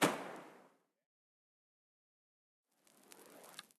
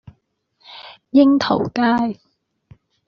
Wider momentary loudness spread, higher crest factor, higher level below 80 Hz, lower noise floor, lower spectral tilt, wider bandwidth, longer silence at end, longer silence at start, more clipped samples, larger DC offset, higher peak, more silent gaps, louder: second, 20 LU vs 24 LU; first, 30 dB vs 18 dB; second, under -90 dBFS vs -58 dBFS; first, -69 dBFS vs -65 dBFS; about the same, -3.5 dB/octave vs -4 dB/octave; first, 14.5 kHz vs 6.8 kHz; second, 0.2 s vs 0.95 s; second, 0 s vs 0.7 s; neither; neither; second, -18 dBFS vs -2 dBFS; first, 1.06-2.64 s vs none; second, -43 LUFS vs -17 LUFS